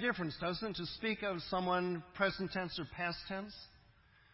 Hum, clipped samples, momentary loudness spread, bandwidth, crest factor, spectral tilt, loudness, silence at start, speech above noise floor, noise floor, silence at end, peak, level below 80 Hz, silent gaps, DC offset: none; under 0.1%; 9 LU; 5.8 kHz; 20 dB; -8.5 dB/octave; -38 LUFS; 0 s; 28 dB; -66 dBFS; 0.55 s; -18 dBFS; -64 dBFS; none; under 0.1%